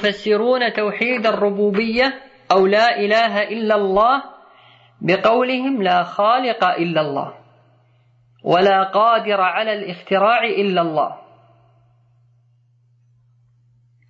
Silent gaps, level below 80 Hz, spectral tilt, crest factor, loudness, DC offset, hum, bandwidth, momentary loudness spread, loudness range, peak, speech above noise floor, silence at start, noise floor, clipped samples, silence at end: none; -58 dBFS; -6 dB/octave; 16 dB; -17 LUFS; under 0.1%; none; 7.8 kHz; 7 LU; 5 LU; -2 dBFS; 41 dB; 0 s; -57 dBFS; under 0.1%; 2.9 s